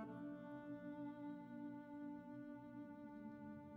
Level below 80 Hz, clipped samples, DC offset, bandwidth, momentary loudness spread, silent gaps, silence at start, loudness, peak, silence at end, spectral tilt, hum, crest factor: -84 dBFS; under 0.1%; under 0.1%; 4.4 kHz; 4 LU; none; 0 s; -54 LUFS; -42 dBFS; 0 s; -7.5 dB/octave; 60 Hz at -70 dBFS; 12 dB